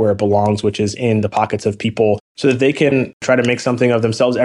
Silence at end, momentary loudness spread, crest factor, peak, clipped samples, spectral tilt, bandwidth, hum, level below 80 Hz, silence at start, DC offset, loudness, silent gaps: 0 s; 4 LU; 12 dB; -4 dBFS; under 0.1%; -6 dB/octave; 11 kHz; none; -52 dBFS; 0 s; under 0.1%; -16 LUFS; 2.20-2.35 s, 3.13-3.20 s